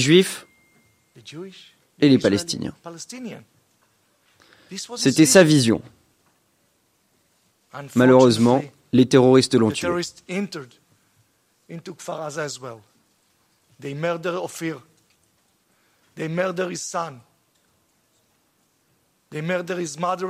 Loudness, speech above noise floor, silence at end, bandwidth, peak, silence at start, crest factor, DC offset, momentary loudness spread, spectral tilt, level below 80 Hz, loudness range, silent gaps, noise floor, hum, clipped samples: -20 LUFS; 46 dB; 0 s; 16 kHz; 0 dBFS; 0 s; 22 dB; under 0.1%; 24 LU; -5 dB/octave; -62 dBFS; 14 LU; none; -66 dBFS; none; under 0.1%